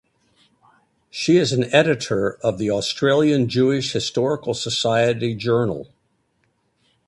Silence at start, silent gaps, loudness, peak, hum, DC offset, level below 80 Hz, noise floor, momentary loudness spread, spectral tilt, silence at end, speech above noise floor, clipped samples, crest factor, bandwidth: 1.15 s; none; -20 LUFS; 0 dBFS; none; under 0.1%; -56 dBFS; -67 dBFS; 6 LU; -5 dB/octave; 1.25 s; 48 dB; under 0.1%; 20 dB; 11.5 kHz